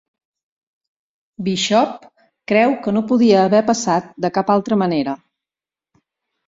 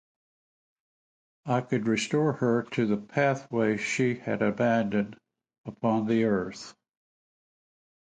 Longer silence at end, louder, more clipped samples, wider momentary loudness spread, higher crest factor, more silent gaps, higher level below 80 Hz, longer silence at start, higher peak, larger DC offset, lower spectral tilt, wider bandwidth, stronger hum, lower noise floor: about the same, 1.3 s vs 1.3 s; first, -17 LUFS vs -27 LUFS; neither; about the same, 12 LU vs 12 LU; about the same, 16 dB vs 18 dB; second, none vs 5.58-5.64 s; first, -60 dBFS vs -66 dBFS; about the same, 1.4 s vs 1.45 s; first, -2 dBFS vs -12 dBFS; neither; about the same, -5 dB/octave vs -6 dB/octave; second, 7.8 kHz vs 9.4 kHz; neither; about the same, under -90 dBFS vs under -90 dBFS